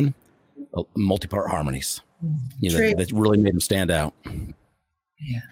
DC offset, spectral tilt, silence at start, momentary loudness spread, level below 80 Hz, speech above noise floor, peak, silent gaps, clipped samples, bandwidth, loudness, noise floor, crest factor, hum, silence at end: under 0.1%; -5.5 dB/octave; 0 s; 16 LU; -44 dBFS; 50 dB; -6 dBFS; none; under 0.1%; 17 kHz; -23 LUFS; -73 dBFS; 18 dB; none; 0.05 s